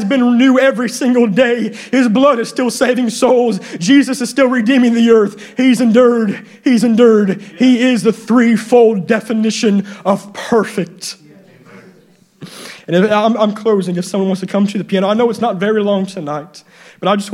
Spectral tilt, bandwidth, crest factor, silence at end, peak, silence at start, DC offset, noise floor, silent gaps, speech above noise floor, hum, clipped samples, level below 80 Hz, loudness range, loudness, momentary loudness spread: -5.5 dB/octave; 13.5 kHz; 12 dB; 0 s; 0 dBFS; 0 s; under 0.1%; -48 dBFS; none; 36 dB; none; under 0.1%; -62 dBFS; 6 LU; -13 LUFS; 9 LU